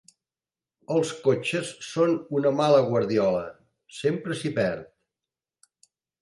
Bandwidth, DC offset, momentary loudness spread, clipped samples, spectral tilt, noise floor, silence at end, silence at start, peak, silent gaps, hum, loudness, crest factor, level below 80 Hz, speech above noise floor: 11.5 kHz; under 0.1%; 10 LU; under 0.1%; -6 dB/octave; under -90 dBFS; 1.35 s; 0.9 s; -6 dBFS; none; none; -25 LUFS; 20 dB; -64 dBFS; over 66 dB